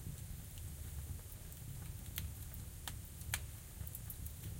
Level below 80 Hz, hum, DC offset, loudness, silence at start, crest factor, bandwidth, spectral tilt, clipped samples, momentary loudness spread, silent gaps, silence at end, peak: -52 dBFS; none; under 0.1%; -48 LUFS; 0 s; 28 dB; 17 kHz; -3.5 dB/octave; under 0.1%; 6 LU; none; 0 s; -20 dBFS